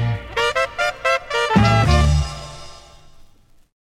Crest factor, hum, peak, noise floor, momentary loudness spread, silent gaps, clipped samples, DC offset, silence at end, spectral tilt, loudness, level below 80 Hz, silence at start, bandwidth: 18 dB; none; -2 dBFS; -49 dBFS; 16 LU; none; under 0.1%; under 0.1%; 0.6 s; -5.5 dB/octave; -18 LUFS; -26 dBFS; 0 s; 12.5 kHz